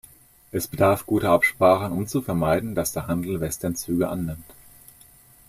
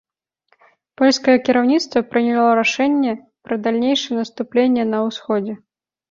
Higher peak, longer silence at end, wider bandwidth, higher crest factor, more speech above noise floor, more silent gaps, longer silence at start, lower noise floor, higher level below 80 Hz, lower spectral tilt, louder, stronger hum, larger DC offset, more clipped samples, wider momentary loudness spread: about the same, -4 dBFS vs -2 dBFS; first, 0.95 s vs 0.55 s; first, 16 kHz vs 7.6 kHz; about the same, 20 dB vs 16 dB; second, 29 dB vs 47 dB; neither; second, 0.55 s vs 1 s; second, -52 dBFS vs -64 dBFS; first, -50 dBFS vs -62 dBFS; first, -5.5 dB/octave vs -4 dB/octave; second, -23 LUFS vs -18 LUFS; neither; neither; neither; about the same, 11 LU vs 9 LU